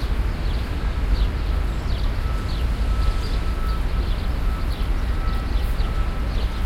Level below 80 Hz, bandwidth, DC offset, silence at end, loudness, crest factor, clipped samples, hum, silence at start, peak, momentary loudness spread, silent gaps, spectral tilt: -22 dBFS; 14.5 kHz; under 0.1%; 0 s; -26 LUFS; 14 dB; under 0.1%; none; 0 s; -8 dBFS; 2 LU; none; -6.5 dB/octave